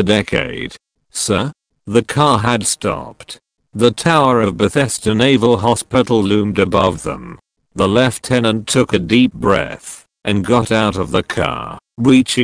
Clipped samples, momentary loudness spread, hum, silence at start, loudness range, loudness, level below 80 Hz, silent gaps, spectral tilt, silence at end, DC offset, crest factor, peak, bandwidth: under 0.1%; 15 LU; none; 0 s; 3 LU; -15 LUFS; -42 dBFS; none; -5 dB/octave; 0 s; under 0.1%; 16 dB; 0 dBFS; 10.5 kHz